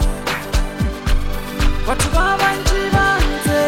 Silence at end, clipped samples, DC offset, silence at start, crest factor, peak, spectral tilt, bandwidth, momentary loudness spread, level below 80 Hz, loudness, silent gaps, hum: 0 s; under 0.1%; under 0.1%; 0 s; 14 dB; -2 dBFS; -4.5 dB/octave; 16.5 kHz; 7 LU; -20 dBFS; -18 LUFS; none; none